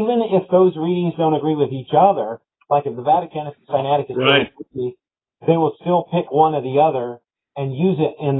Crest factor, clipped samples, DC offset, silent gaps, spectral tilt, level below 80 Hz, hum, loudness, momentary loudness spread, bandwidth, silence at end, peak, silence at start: 18 dB; under 0.1%; under 0.1%; none; -10.5 dB/octave; -64 dBFS; none; -18 LUFS; 12 LU; 4.1 kHz; 0 s; 0 dBFS; 0 s